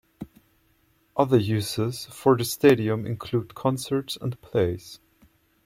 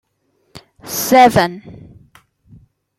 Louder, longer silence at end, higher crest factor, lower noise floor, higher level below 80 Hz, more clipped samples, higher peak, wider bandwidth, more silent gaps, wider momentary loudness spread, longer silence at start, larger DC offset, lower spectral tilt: second, -25 LUFS vs -13 LUFS; second, 0.7 s vs 1.25 s; about the same, 20 dB vs 18 dB; about the same, -65 dBFS vs -63 dBFS; second, -58 dBFS vs -50 dBFS; neither; second, -6 dBFS vs 0 dBFS; about the same, 16.5 kHz vs 16.5 kHz; neither; second, 16 LU vs 25 LU; second, 0.2 s vs 0.55 s; neither; first, -6 dB/octave vs -4 dB/octave